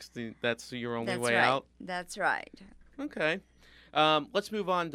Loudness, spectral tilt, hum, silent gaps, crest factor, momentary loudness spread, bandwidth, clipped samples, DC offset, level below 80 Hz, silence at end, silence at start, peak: -30 LUFS; -4 dB/octave; none; none; 22 dB; 13 LU; 16 kHz; under 0.1%; under 0.1%; -64 dBFS; 0 s; 0 s; -10 dBFS